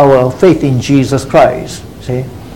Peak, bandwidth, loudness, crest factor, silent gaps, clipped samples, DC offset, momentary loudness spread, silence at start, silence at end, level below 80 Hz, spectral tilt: 0 dBFS; 17 kHz; -10 LUFS; 10 dB; none; 0.9%; 0.8%; 13 LU; 0 s; 0 s; -36 dBFS; -7 dB/octave